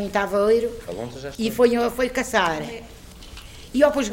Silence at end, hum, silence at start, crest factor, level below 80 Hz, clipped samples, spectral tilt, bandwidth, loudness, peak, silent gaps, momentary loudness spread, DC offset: 0 s; none; 0 s; 16 dB; -46 dBFS; under 0.1%; -4.5 dB/octave; 16.5 kHz; -22 LUFS; -6 dBFS; none; 21 LU; under 0.1%